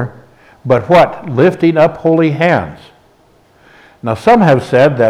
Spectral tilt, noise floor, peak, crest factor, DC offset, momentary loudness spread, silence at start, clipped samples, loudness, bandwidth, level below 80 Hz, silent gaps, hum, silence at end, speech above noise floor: -7.5 dB/octave; -49 dBFS; 0 dBFS; 12 dB; under 0.1%; 14 LU; 0 s; under 0.1%; -11 LUFS; 13 kHz; -48 dBFS; none; none; 0 s; 39 dB